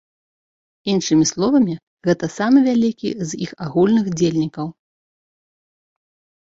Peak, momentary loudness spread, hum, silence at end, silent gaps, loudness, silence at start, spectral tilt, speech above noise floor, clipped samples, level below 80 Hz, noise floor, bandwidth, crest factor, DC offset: -4 dBFS; 11 LU; none; 1.8 s; 1.83-1.97 s; -18 LUFS; 0.85 s; -5.5 dB/octave; over 73 dB; under 0.1%; -58 dBFS; under -90 dBFS; 8 kHz; 16 dB; under 0.1%